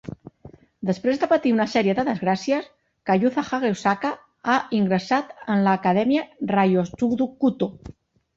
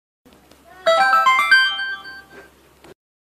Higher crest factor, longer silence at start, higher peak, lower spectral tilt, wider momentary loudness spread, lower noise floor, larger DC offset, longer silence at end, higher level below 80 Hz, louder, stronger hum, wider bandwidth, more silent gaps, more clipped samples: about the same, 16 dB vs 16 dB; second, 0.05 s vs 0.85 s; about the same, -6 dBFS vs -4 dBFS; first, -6.5 dB/octave vs 0 dB/octave; second, 9 LU vs 16 LU; about the same, -48 dBFS vs -49 dBFS; neither; second, 0.5 s vs 0.9 s; about the same, -58 dBFS vs -62 dBFS; second, -22 LUFS vs -15 LUFS; neither; second, 7.8 kHz vs 15 kHz; neither; neither